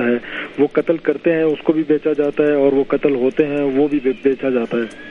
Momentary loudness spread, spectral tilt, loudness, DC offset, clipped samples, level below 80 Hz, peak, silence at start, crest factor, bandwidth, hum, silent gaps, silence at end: 4 LU; -8 dB/octave; -17 LUFS; under 0.1%; under 0.1%; -52 dBFS; 0 dBFS; 0 s; 16 dB; 6.6 kHz; none; none; 0 s